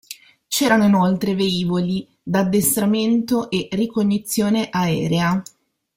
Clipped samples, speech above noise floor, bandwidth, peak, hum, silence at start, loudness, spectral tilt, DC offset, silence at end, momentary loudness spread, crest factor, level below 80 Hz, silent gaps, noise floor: under 0.1%; 21 dB; 16.5 kHz; -4 dBFS; none; 0.1 s; -19 LUFS; -5 dB/octave; under 0.1%; 0.55 s; 8 LU; 14 dB; -54 dBFS; none; -39 dBFS